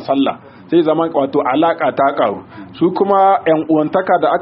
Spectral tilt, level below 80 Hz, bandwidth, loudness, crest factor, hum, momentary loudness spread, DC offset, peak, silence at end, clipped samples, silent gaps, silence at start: -4.5 dB/octave; -60 dBFS; 5.6 kHz; -15 LUFS; 14 dB; none; 7 LU; under 0.1%; 0 dBFS; 0 s; under 0.1%; none; 0 s